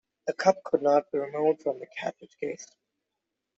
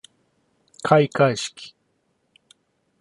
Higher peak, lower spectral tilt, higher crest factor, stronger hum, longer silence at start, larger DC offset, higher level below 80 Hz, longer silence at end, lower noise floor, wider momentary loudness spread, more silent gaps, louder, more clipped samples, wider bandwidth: second, -8 dBFS vs -2 dBFS; about the same, -5 dB/octave vs -5.5 dB/octave; about the same, 22 dB vs 22 dB; neither; second, 0.25 s vs 0.85 s; neither; second, -76 dBFS vs -66 dBFS; second, 0.9 s vs 1.35 s; first, -85 dBFS vs -69 dBFS; second, 12 LU vs 23 LU; neither; second, -28 LUFS vs -20 LUFS; neither; second, 7.8 kHz vs 11.5 kHz